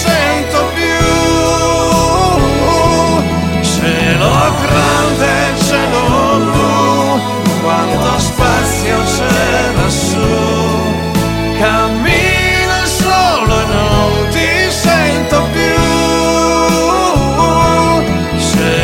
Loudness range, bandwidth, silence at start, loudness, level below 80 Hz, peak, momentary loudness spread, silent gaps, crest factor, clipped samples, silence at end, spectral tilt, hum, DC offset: 1 LU; 16.5 kHz; 0 s; -11 LUFS; -24 dBFS; 0 dBFS; 3 LU; none; 10 dB; under 0.1%; 0 s; -4.5 dB/octave; none; under 0.1%